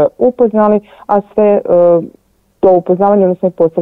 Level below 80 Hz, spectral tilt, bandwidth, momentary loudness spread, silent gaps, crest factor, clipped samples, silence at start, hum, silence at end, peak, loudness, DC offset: -50 dBFS; -11 dB/octave; 3.8 kHz; 6 LU; none; 10 dB; under 0.1%; 0 s; none; 0 s; 0 dBFS; -11 LUFS; 0.4%